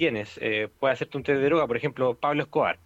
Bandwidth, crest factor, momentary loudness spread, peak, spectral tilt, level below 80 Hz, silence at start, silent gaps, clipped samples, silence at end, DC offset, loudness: 8 kHz; 14 dB; 5 LU; -12 dBFS; -6.5 dB/octave; -60 dBFS; 0 s; none; under 0.1%; 0.1 s; under 0.1%; -26 LUFS